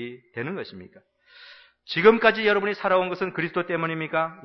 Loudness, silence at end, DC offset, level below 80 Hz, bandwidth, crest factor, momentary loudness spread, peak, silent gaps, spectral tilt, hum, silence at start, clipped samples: -23 LUFS; 0.05 s; under 0.1%; -64 dBFS; 6 kHz; 20 dB; 16 LU; -4 dBFS; none; -7 dB/octave; none; 0 s; under 0.1%